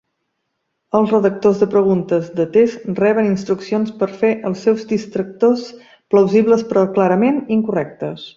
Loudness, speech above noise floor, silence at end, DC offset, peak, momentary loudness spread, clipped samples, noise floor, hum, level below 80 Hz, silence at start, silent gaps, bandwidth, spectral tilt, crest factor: -16 LUFS; 57 dB; 0.05 s; under 0.1%; -2 dBFS; 7 LU; under 0.1%; -73 dBFS; none; -58 dBFS; 0.95 s; none; 7.6 kHz; -7.5 dB/octave; 14 dB